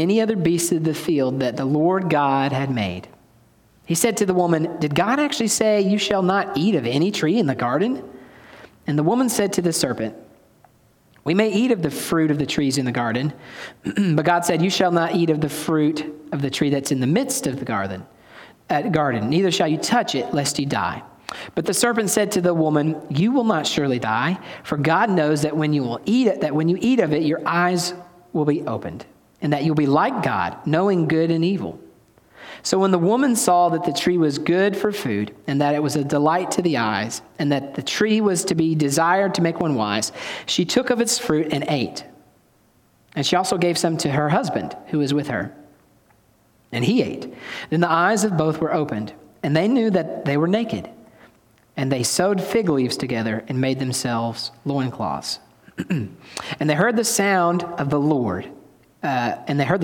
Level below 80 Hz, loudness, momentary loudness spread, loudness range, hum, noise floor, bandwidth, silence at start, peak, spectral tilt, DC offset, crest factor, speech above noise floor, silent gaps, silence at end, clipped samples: -58 dBFS; -21 LUFS; 10 LU; 3 LU; none; -58 dBFS; 18 kHz; 0 s; -4 dBFS; -5 dB/octave; under 0.1%; 16 dB; 38 dB; none; 0 s; under 0.1%